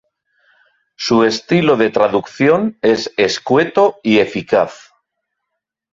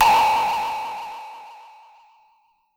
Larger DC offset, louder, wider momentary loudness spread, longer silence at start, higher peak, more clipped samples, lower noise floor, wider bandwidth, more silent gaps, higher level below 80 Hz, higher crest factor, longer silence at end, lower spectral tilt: neither; first, -15 LUFS vs -21 LUFS; second, 4 LU vs 24 LU; first, 1 s vs 0 s; first, 0 dBFS vs -6 dBFS; neither; first, -77 dBFS vs -62 dBFS; second, 7.8 kHz vs 17.5 kHz; neither; about the same, -56 dBFS vs -54 dBFS; about the same, 16 dB vs 16 dB; about the same, 1.2 s vs 1.15 s; first, -5.5 dB/octave vs -1.5 dB/octave